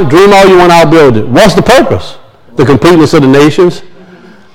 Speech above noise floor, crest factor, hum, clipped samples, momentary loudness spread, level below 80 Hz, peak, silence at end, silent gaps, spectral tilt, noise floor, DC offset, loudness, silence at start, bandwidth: 30 dB; 4 dB; none; 10%; 8 LU; -30 dBFS; 0 dBFS; 0.65 s; none; -6 dB/octave; -34 dBFS; under 0.1%; -4 LUFS; 0 s; 18.5 kHz